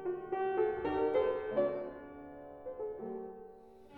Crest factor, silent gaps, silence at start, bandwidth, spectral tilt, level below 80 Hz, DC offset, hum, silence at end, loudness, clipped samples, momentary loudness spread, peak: 16 dB; none; 0 s; 4.5 kHz; -8.5 dB/octave; -64 dBFS; under 0.1%; none; 0 s; -36 LUFS; under 0.1%; 18 LU; -20 dBFS